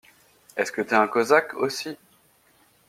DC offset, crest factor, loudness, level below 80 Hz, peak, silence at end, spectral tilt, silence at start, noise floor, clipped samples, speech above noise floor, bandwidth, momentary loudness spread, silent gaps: under 0.1%; 22 dB; -23 LUFS; -74 dBFS; -4 dBFS; 0.95 s; -3.5 dB/octave; 0.55 s; -61 dBFS; under 0.1%; 38 dB; 16 kHz; 16 LU; none